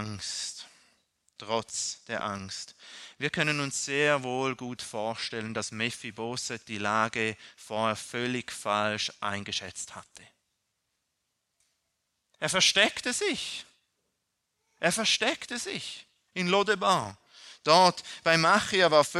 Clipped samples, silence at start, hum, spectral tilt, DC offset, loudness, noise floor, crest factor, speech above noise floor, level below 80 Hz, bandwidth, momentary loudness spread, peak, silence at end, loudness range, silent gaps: under 0.1%; 0 s; none; -2.5 dB/octave; under 0.1%; -28 LUFS; -81 dBFS; 24 dB; 52 dB; -70 dBFS; 13.5 kHz; 17 LU; -6 dBFS; 0 s; 8 LU; none